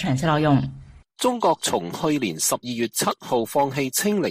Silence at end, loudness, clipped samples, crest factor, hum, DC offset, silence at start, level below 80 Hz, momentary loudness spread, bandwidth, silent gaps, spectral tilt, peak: 0 s; -22 LUFS; under 0.1%; 16 dB; none; under 0.1%; 0 s; -52 dBFS; 5 LU; 15.5 kHz; none; -4.5 dB/octave; -6 dBFS